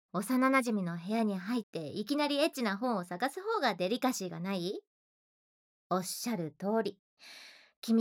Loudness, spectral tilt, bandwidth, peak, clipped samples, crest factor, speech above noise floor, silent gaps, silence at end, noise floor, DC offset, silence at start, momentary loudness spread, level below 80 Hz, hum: -33 LUFS; -4.5 dB/octave; 19.5 kHz; -14 dBFS; under 0.1%; 20 dB; over 57 dB; 1.63-1.73 s, 4.87-5.90 s, 6.99-7.17 s, 7.76-7.82 s; 0 s; under -90 dBFS; under 0.1%; 0.15 s; 11 LU; under -90 dBFS; none